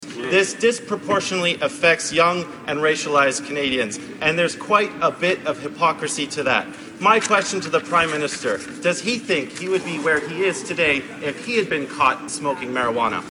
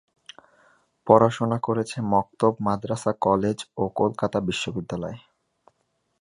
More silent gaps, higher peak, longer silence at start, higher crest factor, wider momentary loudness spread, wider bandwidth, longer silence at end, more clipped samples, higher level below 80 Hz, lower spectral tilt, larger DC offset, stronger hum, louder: neither; about the same, -2 dBFS vs -2 dBFS; second, 0 s vs 1.05 s; about the same, 20 dB vs 24 dB; second, 7 LU vs 13 LU; about the same, 11.5 kHz vs 11.5 kHz; second, 0 s vs 1.05 s; neither; about the same, -58 dBFS vs -56 dBFS; second, -3 dB/octave vs -6.5 dB/octave; neither; neither; first, -20 LUFS vs -24 LUFS